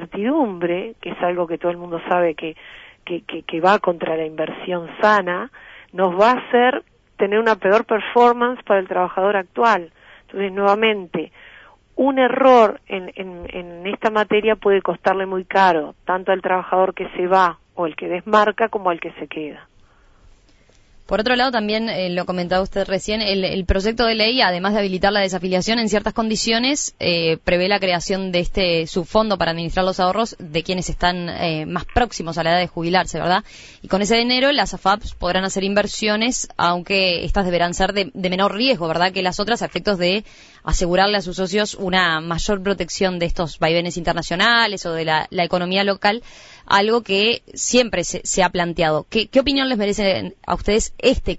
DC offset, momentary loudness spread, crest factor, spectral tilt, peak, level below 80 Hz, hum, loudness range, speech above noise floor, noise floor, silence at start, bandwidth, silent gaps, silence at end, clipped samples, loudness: under 0.1%; 10 LU; 16 dB; -4 dB/octave; -2 dBFS; -36 dBFS; none; 4 LU; 34 dB; -52 dBFS; 0 s; 8 kHz; none; 0 s; under 0.1%; -19 LUFS